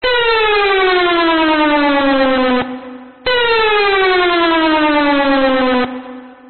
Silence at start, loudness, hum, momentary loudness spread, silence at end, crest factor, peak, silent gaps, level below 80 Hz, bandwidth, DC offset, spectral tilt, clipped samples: 0 s; -12 LUFS; none; 10 LU; 0 s; 10 dB; -4 dBFS; none; -40 dBFS; 4.6 kHz; 2%; 0 dB/octave; under 0.1%